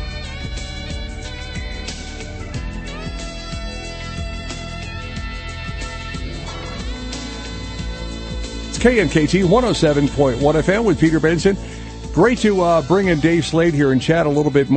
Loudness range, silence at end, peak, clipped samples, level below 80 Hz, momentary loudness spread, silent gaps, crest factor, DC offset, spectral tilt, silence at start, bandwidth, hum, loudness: 12 LU; 0 s; 0 dBFS; under 0.1%; -32 dBFS; 14 LU; none; 18 dB; under 0.1%; -6 dB/octave; 0 s; 8.8 kHz; none; -19 LUFS